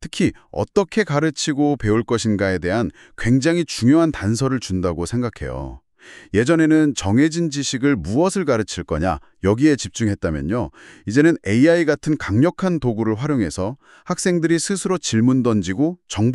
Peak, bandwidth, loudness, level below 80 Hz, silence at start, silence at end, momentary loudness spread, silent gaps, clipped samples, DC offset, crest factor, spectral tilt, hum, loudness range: -2 dBFS; 12 kHz; -19 LUFS; -42 dBFS; 0 s; 0 s; 8 LU; none; under 0.1%; under 0.1%; 16 dB; -5.5 dB/octave; none; 2 LU